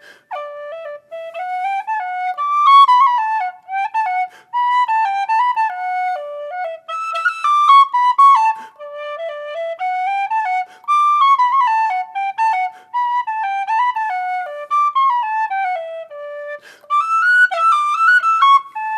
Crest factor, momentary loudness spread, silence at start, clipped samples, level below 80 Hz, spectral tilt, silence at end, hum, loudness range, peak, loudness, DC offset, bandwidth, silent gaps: 14 dB; 19 LU; 0.3 s; under 0.1%; -88 dBFS; 1.5 dB/octave; 0 s; none; 4 LU; -2 dBFS; -15 LUFS; under 0.1%; 11 kHz; none